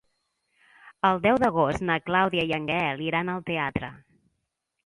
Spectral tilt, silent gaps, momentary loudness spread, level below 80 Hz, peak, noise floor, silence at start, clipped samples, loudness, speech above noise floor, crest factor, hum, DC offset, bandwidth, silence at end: -6.5 dB/octave; none; 7 LU; -54 dBFS; -8 dBFS; -80 dBFS; 0.85 s; under 0.1%; -25 LUFS; 55 dB; 20 dB; none; under 0.1%; 11.5 kHz; 0.9 s